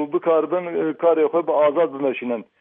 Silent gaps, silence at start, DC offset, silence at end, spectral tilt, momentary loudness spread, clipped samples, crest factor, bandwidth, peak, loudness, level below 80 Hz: none; 0 s; under 0.1%; 0.15 s; -10 dB/octave; 7 LU; under 0.1%; 14 dB; 3.8 kHz; -6 dBFS; -20 LUFS; -78 dBFS